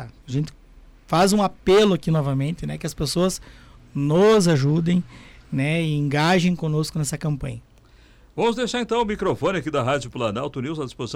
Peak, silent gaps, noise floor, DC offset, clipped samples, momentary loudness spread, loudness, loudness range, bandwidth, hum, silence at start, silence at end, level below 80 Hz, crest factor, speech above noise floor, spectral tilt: -10 dBFS; none; -51 dBFS; under 0.1%; under 0.1%; 13 LU; -22 LUFS; 4 LU; 16 kHz; none; 0 s; 0 s; -46 dBFS; 12 dB; 30 dB; -6 dB/octave